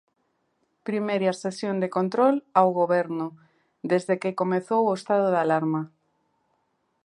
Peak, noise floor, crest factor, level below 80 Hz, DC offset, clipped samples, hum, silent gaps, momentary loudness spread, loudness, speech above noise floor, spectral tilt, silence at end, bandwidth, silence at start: -4 dBFS; -72 dBFS; 20 dB; -78 dBFS; under 0.1%; under 0.1%; none; none; 10 LU; -24 LUFS; 49 dB; -7 dB/octave; 1.15 s; 11.5 kHz; 0.85 s